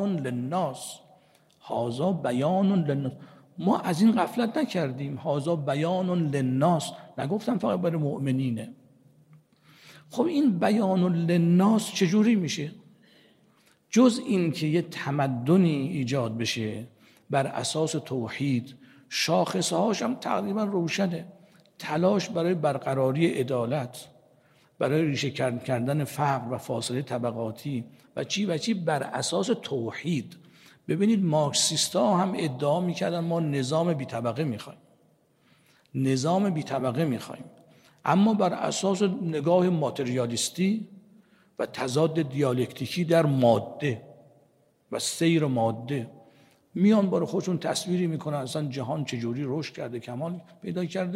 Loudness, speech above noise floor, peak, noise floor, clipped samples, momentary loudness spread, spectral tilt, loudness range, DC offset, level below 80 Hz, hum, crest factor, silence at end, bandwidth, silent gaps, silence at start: -27 LUFS; 38 dB; -8 dBFS; -64 dBFS; under 0.1%; 12 LU; -5.5 dB/octave; 4 LU; under 0.1%; -72 dBFS; none; 18 dB; 0 s; 15.5 kHz; none; 0 s